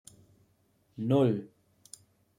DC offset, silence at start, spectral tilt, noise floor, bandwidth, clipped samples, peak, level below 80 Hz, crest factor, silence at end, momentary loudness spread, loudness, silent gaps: under 0.1%; 1 s; -8 dB/octave; -70 dBFS; 15 kHz; under 0.1%; -14 dBFS; -74 dBFS; 18 dB; 0.9 s; 25 LU; -29 LUFS; none